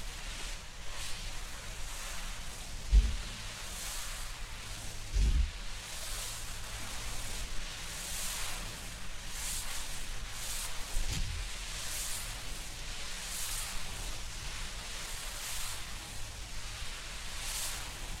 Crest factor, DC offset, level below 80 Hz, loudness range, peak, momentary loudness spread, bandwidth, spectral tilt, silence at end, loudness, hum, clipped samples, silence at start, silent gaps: 22 dB; under 0.1%; -38 dBFS; 2 LU; -14 dBFS; 7 LU; 16 kHz; -2 dB/octave; 0 s; -39 LUFS; none; under 0.1%; 0 s; none